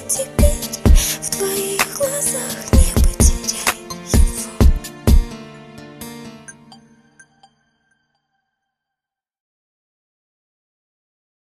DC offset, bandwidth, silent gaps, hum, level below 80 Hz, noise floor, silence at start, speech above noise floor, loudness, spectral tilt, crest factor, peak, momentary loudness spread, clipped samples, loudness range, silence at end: under 0.1%; 14 kHz; none; none; -20 dBFS; -86 dBFS; 0 s; 68 dB; -18 LUFS; -4 dB/octave; 18 dB; 0 dBFS; 20 LU; under 0.1%; 20 LU; 4.95 s